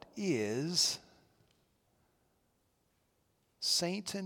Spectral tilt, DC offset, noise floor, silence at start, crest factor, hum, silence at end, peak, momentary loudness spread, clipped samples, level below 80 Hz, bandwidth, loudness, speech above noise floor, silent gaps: -3 dB/octave; under 0.1%; -76 dBFS; 0.15 s; 22 dB; none; 0 s; -18 dBFS; 7 LU; under 0.1%; -80 dBFS; 18 kHz; -33 LUFS; 42 dB; none